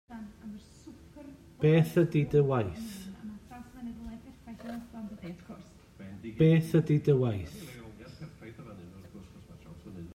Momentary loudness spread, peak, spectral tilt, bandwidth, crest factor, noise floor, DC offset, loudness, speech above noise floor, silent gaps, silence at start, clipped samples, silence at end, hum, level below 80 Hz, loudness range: 25 LU; -14 dBFS; -8.5 dB/octave; 14.5 kHz; 18 dB; -52 dBFS; under 0.1%; -27 LUFS; 26 dB; none; 0.1 s; under 0.1%; 0 s; none; -58 dBFS; 14 LU